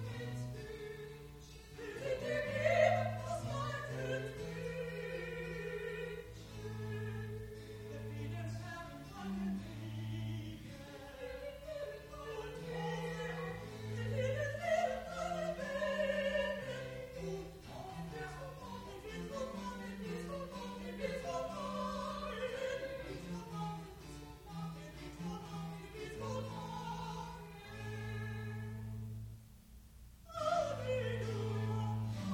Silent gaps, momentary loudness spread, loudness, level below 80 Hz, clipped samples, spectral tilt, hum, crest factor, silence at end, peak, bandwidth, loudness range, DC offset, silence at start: none; 13 LU; -42 LUFS; -58 dBFS; under 0.1%; -6 dB/octave; none; 24 dB; 0 s; -16 dBFS; 16.5 kHz; 8 LU; under 0.1%; 0 s